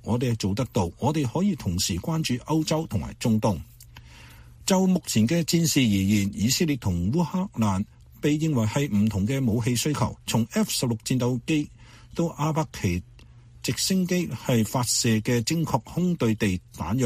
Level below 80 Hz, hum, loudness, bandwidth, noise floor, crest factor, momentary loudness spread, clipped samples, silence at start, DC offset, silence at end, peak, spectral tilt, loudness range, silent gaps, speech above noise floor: -48 dBFS; none; -25 LUFS; 15.5 kHz; -49 dBFS; 18 dB; 7 LU; under 0.1%; 0.05 s; under 0.1%; 0 s; -6 dBFS; -5 dB/octave; 4 LU; none; 25 dB